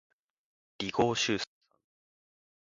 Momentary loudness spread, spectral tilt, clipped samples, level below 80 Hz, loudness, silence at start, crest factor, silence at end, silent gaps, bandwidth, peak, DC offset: 11 LU; -3.5 dB/octave; under 0.1%; -66 dBFS; -31 LUFS; 0.8 s; 24 dB; 1.25 s; none; 9.6 kHz; -12 dBFS; under 0.1%